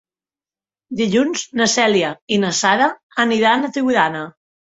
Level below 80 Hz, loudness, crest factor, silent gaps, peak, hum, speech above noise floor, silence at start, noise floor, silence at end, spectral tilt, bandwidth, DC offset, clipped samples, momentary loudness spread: -60 dBFS; -17 LUFS; 16 dB; 2.22-2.28 s, 3.03-3.10 s; -2 dBFS; none; over 73 dB; 0.9 s; under -90 dBFS; 0.45 s; -3 dB/octave; 8.2 kHz; under 0.1%; under 0.1%; 6 LU